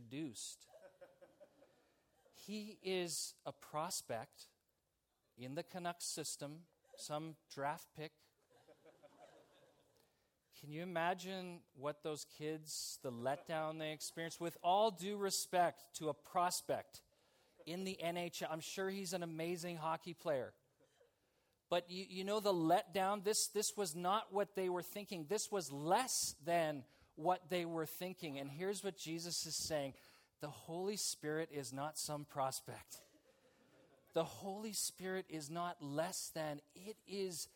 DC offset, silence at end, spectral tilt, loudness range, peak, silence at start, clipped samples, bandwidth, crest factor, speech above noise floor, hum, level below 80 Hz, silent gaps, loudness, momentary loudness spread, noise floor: under 0.1%; 0.1 s; -3.5 dB/octave; 9 LU; -22 dBFS; 0 s; under 0.1%; 17.5 kHz; 20 dB; 43 dB; none; -84 dBFS; none; -42 LUFS; 15 LU; -86 dBFS